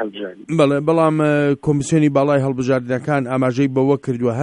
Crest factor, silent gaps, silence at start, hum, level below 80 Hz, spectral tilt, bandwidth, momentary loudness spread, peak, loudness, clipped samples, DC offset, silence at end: 14 dB; none; 0 s; none; -52 dBFS; -7 dB/octave; 11 kHz; 5 LU; -4 dBFS; -17 LUFS; under 0.1%; under 0.1%; 0 s